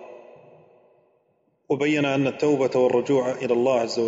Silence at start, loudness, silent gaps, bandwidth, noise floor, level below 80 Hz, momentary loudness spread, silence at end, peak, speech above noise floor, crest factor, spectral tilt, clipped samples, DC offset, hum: 0 s; -22 LUFS; none; 8 kHz; -67 dBFS; -70 dBFS; 4 LU; 0 s; -8 dBFS; 46 dB; 14 dB; -6 dB/octave; under 0.1%; under 0.1%; none